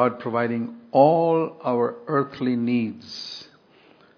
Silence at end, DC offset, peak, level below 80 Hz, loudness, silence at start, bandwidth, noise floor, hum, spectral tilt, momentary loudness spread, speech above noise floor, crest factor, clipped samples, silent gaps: 0.75 s; under 0.1%; -4 dBFS; -72 dBFS; -23 LUFS; 0 s; 5.4 kHz; -55 dBFS; none; -7.5 dB/octave; 15 LU; 32 dB; 18 dB; under 0.1%; none